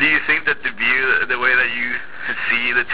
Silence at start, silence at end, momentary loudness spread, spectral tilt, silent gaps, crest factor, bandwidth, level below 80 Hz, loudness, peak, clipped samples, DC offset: 0 s; 0 s; 8 LU; -5.5 dB/octave; none; 16 dB; 4 kHz; -52 dBFS; -17 LUFS; -4 dBFS; under 0.1%; 3%